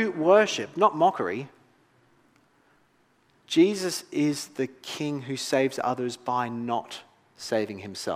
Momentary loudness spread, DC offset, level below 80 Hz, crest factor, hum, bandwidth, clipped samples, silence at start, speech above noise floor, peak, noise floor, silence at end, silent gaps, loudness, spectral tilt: 13 LU; under 0.1%; -78 dBFS; 20 dB; none; 16 kHz; under 0.1%; 0 s; 39 dB; -6 dBFS; -65 dBFS; 0 s; none; -26 LUFS; -4.5 dB/octave